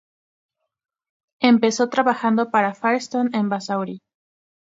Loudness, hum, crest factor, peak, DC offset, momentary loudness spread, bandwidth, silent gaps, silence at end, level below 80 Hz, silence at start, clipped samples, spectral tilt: -20 LUFS; none; 22 dB; 0 dBFS; under 0.1%; 9 LU; 7.8 kHz; none; 0.8 s; -72 dBFS; 1.4 s; under 0.1%; -5 dB/octave